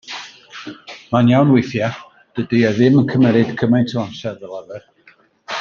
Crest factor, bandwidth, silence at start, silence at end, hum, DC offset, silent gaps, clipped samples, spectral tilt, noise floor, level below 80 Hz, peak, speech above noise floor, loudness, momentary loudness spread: 16 dB; 7 kHz; 0.05 s; 0 s; none; under 0.1%; none; under 0.1%; -7.5 dB/octave; -52 dBFS; -56 dBFS; -2 dBFS; 37 dB; -16 LUFS; 21 LU